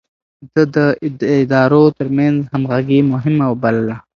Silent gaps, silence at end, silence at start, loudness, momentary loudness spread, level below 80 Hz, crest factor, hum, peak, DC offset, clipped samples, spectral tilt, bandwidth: none; 0.15 s; 0.4 s; -14 LUFS; 6 LU; -54 dBFS; 14 dB; none; 0 dBFS; under 0.1%; under 0.1%; -9 dB/octave; 6.8 kHz